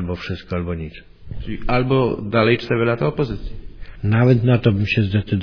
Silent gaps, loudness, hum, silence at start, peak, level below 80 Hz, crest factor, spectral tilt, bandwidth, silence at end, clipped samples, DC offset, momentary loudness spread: none; -19 LUFS; none; 0 s; -2 dBFS; -36 dBFS; 18 dB; -9 dB/octave; 5.4 kHz; 0 s; under 0.1%; under 0.1%; 16 LU